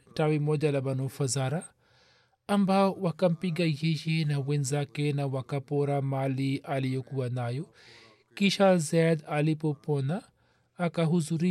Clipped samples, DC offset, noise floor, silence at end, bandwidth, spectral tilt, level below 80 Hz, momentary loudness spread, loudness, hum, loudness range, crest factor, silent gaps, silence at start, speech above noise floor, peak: under 0.1%; under 0.1%; -65 dBFS; 0 s; 13.5 kHz; -6 dB/octave; -74 dBFS; 9 LU; -28 LUFS; none; 3 LU; 16 dB; none; 0.15 s; 37 dB; -12 dBFS